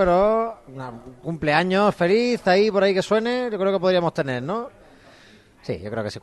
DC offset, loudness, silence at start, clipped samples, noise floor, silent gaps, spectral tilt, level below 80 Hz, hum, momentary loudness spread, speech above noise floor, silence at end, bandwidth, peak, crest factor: under 0.1%; -21 LUFS; 0 s; under 0.1%; -51 dBFS; none; -6 dB/octave; -50 dBFS; none; 18 LU; 30 dB; 0.05 s; 12 kHz; -4 dBFS; 16 dB